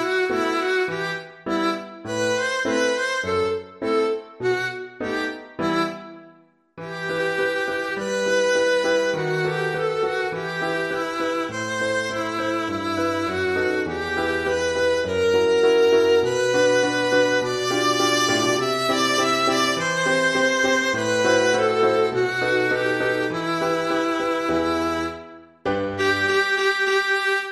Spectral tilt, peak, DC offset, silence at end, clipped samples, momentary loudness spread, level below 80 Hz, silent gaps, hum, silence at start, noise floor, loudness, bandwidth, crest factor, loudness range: -3.5 dB/octave; -6 dBFS; under 0.1%; 0 s; under 0.1%; 8 LU; -56 dBFS; none; none; 0 s; -53 dBFS; -21 LUFS; 13.5 kHz; 14 dB; 6 LU